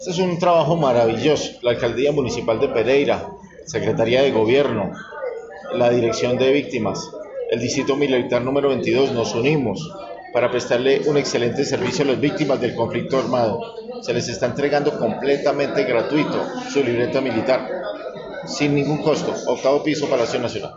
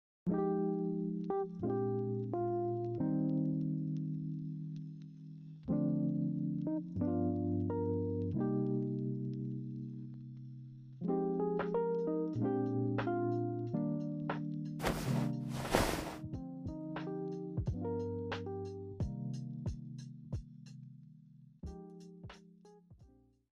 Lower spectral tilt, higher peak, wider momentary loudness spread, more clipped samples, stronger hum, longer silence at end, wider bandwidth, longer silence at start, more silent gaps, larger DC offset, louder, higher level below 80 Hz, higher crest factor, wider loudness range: second, -4.5 dB/octave vs -7.5 dB/octave; first, -4 dBFS vs -12 dBFS; second, 11 LU vs 15 LU; neither; neither; second, 0 s vs 0.45 s; second, 8 kHz vs 15.5 kHz; second, 0 s vs 0.25 s; neither; neither; first, -20 LUFS vs -38 LUFS; about the same, -52 dBFS vs -56 dBFS; second, 14 dB vs 26 dB; second, 2 LU vs 9 LU